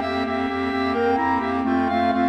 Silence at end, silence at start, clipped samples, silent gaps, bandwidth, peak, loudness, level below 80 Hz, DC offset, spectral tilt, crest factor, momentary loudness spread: 0 s; 0 s; under 0.1%; none; 8.4 kHz; -8 dBFS; -22 LUFS; -48 dBFS; under 0.1%; -6.5 dB/octave; 12 dB; 3 LU